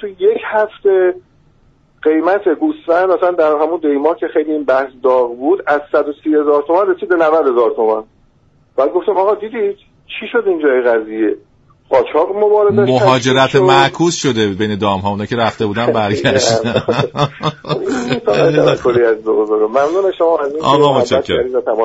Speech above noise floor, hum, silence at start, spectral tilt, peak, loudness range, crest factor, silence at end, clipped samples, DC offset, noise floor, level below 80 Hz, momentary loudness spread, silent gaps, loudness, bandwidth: 39 dB; none; 0 s; -5.5 dB/octave; 0 dBFS; 4 LU; 14 dB; 0 s; under 0.1%; under 0.1%; -52 dBFS; -50 dBFS; 7 LU; none; -14 LUFS; 8 kHz